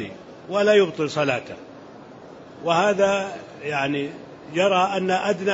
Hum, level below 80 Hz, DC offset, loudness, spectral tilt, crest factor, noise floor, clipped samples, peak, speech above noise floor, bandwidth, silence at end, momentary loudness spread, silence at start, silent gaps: none; -64 dBFS; under 0.1%; -22 LUFS; -5 dB/octave; 18 dB; -42 dBFS; under 0.1%; -6 dBFS; 21 dB; 8 kHz; 0 s; 24 LU; 0 s; none